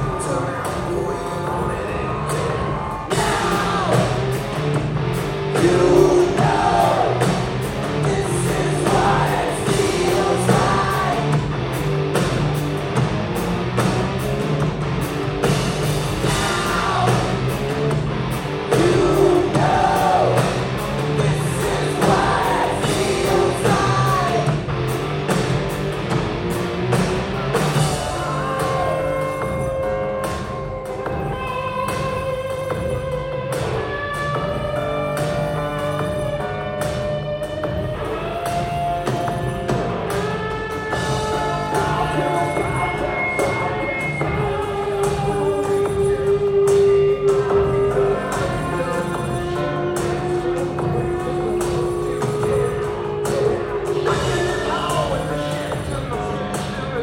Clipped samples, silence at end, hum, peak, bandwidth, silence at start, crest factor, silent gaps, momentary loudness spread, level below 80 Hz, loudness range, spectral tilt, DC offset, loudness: under 0.1%; 0 s; none; -2 dBFS; 16.5 kHz; 0 s; 18 dB; none; 8 LU; -36 dBFS; 6 LU; -5.5 dB/octave; under 0.1%; -20 LUFS